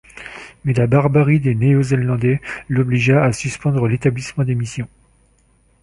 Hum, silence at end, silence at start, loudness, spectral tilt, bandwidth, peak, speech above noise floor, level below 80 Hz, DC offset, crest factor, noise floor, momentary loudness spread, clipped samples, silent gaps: none; 0.95 s; 0.15 s; -17 LUFS; -7.5 dB/octave; 11.5 kHz; -2 dBFS; 40 dB; -46 dBFS; under 0.1%; 16 dB; -56 dBFS; 13 LU; under 0.1%; none